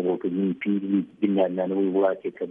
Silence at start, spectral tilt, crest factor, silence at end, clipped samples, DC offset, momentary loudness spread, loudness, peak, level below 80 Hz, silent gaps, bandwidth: 0 s; -10.5 dB/octave; 14 dB; 0 s; under 0.1%; under 0.1%; 4 LU; -25 LUFS; -10 dBFS; -74 dBFS; none; 3.7 kHz